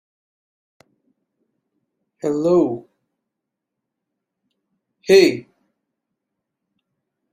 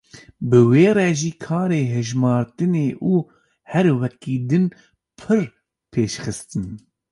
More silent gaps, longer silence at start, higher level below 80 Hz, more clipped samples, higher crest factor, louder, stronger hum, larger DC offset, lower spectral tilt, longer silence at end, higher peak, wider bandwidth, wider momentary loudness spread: neither; first, 2.25 s vs 0.15 s; second, -66 dBFS vs -54 dBFS; neither; about the same, 22 dB vs 18 dB; first, -17 LUFS vs -20 LUFS; neither; neither; second, -5 dB/octave vs -7 dB/octave; first, 1.9 s vs 0.35 s; about the same, -2 dBFS vs -2 dBFS; first, 15 kHz vs 11.5 kHz; first, 20 LU vs 15 LU